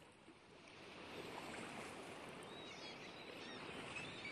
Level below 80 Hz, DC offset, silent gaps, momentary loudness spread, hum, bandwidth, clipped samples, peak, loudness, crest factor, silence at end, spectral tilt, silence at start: -78 dBFS; under 0.1%; none; 12 LU; none; 13.5 kHz; under 0.1%; -36 dBFS; -52 LUFS; 16 dB; 0 s; -3.5 dB/octave; 0 s